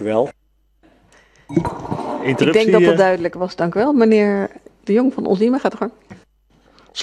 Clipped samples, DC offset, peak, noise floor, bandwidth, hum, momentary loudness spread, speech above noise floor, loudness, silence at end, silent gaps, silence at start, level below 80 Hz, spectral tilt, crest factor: under 0.1%; under 0.1%; 0 dBFS; -56 dBFS; 11 kHz; none; 13 LU; 40 dB; -17 LUFS; 0 s; none; 0 s; -50 dBFS; -6.5 dB/octave; 18 dB